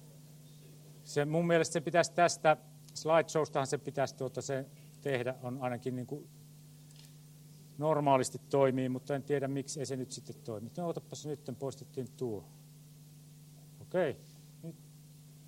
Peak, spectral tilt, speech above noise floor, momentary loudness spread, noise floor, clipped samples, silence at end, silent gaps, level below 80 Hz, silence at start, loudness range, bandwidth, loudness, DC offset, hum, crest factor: -12 dBFS; -5 dB/octave; 22 dB; 26 LU; -55 dBFS; under 0.1%; 0 s; none; -76 dBFS; 0 s; 11 LU; 16.5 kHz; -34 LUFS; under 0.1%; none; 24 dB